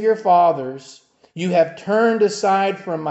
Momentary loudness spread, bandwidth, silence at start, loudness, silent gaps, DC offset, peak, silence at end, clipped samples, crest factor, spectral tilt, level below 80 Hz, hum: 14 LU; 8.2 kHz; 0 s; -18 LUFS; none; under 0.1%; -4 dBFS; 0 s; under 0.1%; 14 dB; -5.5 dB/octave; -72 dBFS; none